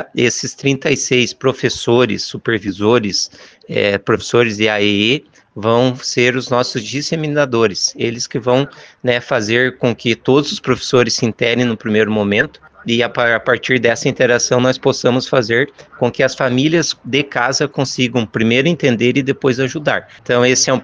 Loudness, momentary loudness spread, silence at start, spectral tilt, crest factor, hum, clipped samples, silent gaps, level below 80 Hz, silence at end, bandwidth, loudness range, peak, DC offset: -15 LUFS; 6 LU; 0 s; -4 dB/octave; 16 dB; none; under 0.1%; none; -52 dBFS; 0 s; 10 kHz; 2 LU; 0 dBFS; under 0.1%